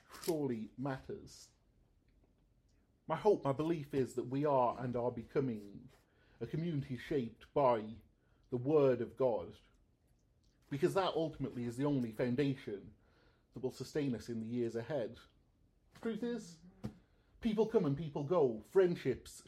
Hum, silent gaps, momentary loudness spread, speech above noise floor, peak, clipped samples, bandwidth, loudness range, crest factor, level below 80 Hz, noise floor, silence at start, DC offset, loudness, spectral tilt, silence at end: none; none; 16 LU; 36 dB; -18 dBFS; under 0.1%; 15 kHz; 6 LU; 20 dB; -68 dBFS; -73 dBFS; 0.1 s; under 0.1%; -37 LUFS; -7 dB/octave; 0.05 s